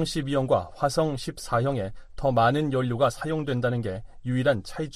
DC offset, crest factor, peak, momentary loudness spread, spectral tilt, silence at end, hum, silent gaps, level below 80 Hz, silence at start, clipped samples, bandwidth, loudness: under 0.1%; 16 dB; -10 dBFS; 9 LU; -6 dB/octave; 0 s; none; none; -46 dBFS; 0 s; under 0.1%; 14.5 kHz; -26 LUFS